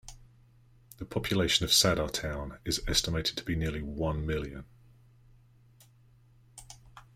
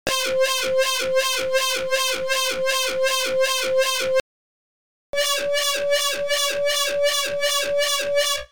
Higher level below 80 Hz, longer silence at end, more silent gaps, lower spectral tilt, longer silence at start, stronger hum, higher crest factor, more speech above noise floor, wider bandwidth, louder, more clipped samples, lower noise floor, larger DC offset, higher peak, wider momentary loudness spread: first, -46 dBFS vs -54 dBFS; first, 0.15 s vs 0 s; second, none vs 4.20-5.13 s; first, -3.5 dB/octave vs 0.5 dB/octave; about the same, 0.05 s vs 0.05 s; neither; first, 22 dB vs 16 dB; second, 30 dB vs over 68 dB; second, 16 kHz vs over 20 kHz; second, -29 LUFS vs -21 LUFS; neither; second, -60 dBFS vs under -90 dBFS; second, under 0.1% vs 1%; second, -10 dBFS vs -4 dBFS; first, 24 LU vs 1 LU